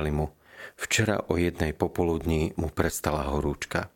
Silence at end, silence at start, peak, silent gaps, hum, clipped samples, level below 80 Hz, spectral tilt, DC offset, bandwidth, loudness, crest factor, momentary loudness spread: 0.1 s; 0 s; -4 dBFS; none; none; under 0.1%; -40 dBFS; -5 dB/octave; under 0.1%; 17 kHz; -28 LUFS; 24 dB; 8 LU